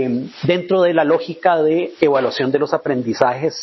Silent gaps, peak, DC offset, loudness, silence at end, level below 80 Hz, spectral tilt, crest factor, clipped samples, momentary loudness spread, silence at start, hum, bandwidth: none; 0 dBFS; under 0.1%; -17 LUFS; 0 s; -60 dBFS; -6.5 dB/octave; 16 dB; under 0.1%; 5 LU; 0 s; none; 6.2 kHz